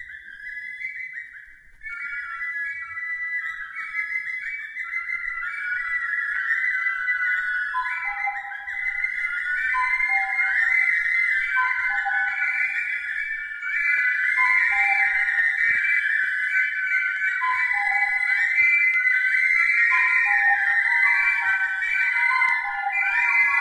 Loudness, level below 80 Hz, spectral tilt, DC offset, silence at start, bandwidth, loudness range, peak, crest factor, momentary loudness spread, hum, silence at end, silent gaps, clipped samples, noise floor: -21 LUFS; -60 dBFS; 1 dB/octave; under 0.1%; 0 s; 12.5 kHz; 10 LU; -8 dBFS; 14 dB; 13 LU; none; 0 s; none; under 0.1%; -45 dBFS